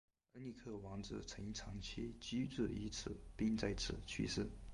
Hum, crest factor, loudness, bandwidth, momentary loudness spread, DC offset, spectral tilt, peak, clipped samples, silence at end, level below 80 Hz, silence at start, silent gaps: none; 18 dB; -45 LUFS; 11.5 kHz; 10 LU; under 0.1%; -5 dB/octave; -26 dBFS; under 0.1%; 0 s; -56 dBFS; 0.35 s; none